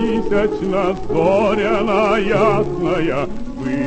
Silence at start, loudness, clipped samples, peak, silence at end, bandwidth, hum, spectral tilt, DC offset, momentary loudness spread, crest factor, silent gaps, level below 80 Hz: 0 s; -17 LUFS; under 0.1%; -2 dBFS; 0 s; 8.6 kHz; none; -7 dB/octave; under 0.1%; 7 LU; 14 dB; none; -34 dBFS